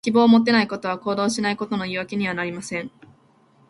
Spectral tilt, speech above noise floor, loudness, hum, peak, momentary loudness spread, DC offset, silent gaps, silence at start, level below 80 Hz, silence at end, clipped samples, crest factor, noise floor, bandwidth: -5 dB/octave; 36 dB; -21 LUFS; none; -4 dBFS; 14 LU; under 0.1%; none; 0.05 s; -62 dBFS; 0.8 s; under 0.1%; 18 dB; -57 dBFS; 11.5 kHz